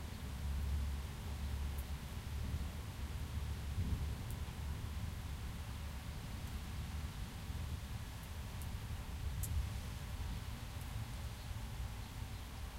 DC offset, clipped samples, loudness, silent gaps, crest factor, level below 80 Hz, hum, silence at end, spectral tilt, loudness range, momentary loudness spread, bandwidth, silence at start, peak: under 0.1%; under 0.1%; -45 LUFS; none; 16 dB; -46 dBFS; none; 0 s; -5 dB/octave; 2 LU; 6 LU; 16 kHz; 0 s; -26 dBFS